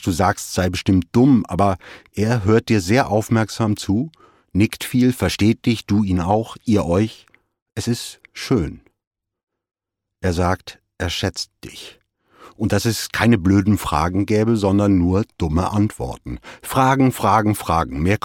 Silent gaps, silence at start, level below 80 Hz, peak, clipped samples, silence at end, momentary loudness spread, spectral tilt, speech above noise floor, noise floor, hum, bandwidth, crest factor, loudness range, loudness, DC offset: 7.62-7.66 s, 9.07-9.11 s, 9.43-9.47 s; 0 s; -40 dBFS; -2 dBFS; under 0.1%; 0.1 s; 14 LU; -6 dB/octave; 30 dB; -48 dBFS; none; 17.5 kHz; 18 dB; 8 LU; -19 LUFS; under 0.1%